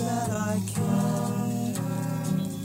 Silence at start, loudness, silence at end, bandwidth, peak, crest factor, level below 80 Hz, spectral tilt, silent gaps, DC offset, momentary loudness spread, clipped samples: 0 s; -28 LUFS; 0 s; 16 kHz; -14 dBFS; 14 dB; -58 dBFS; -6 dB/octave; none; under 0.1%; 4 LU; under 0.1%